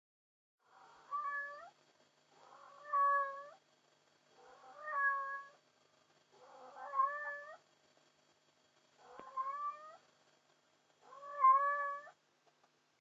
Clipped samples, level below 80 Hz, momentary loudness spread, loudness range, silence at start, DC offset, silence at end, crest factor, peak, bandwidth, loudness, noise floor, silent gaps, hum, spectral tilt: under 0.1%; under -90 dBFS; 25 LU; 11 LU; 1.1 s; under 0.1%; 0.9 s; 22 dB; -20 dBFS; 7.6 kHz; -37 LUFS; -75 dBFS; none; none; 1.5 dB/octave